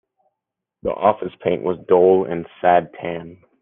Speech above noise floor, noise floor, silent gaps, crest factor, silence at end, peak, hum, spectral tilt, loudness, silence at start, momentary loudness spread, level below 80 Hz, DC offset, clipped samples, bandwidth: 64 dB; -83 dBFS; none; 18 dB; 0.25 s; -2 dBFS; none; -10 dB/octave; -19 LUFS; 0.85 s; 14 LU; -56 dBFS; under 0.1%; under 0.1%; 3.8 kHz